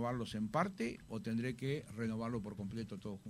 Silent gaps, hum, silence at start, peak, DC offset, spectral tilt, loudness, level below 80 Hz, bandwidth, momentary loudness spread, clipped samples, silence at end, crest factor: none; none; 0 s; -18 dBFS; under 0.1%; -6.5 dB/octave; -41 LUFS; -64 dBFS; 14 kHz; 8 LU; under 0.1%; 0 s; 22 dB